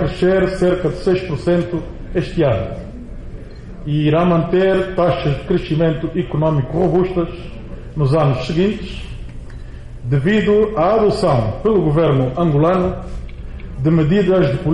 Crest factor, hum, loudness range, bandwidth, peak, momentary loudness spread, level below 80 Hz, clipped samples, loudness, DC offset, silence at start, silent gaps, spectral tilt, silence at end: 12 dB; none; 4 LU; 10.5 kHz; -4 dBFS; 19 LU; -32 dBFS; under 0.1%; -16 LUFS; 0.2%; 0 s; none; -8.5 dB/octave; 0 s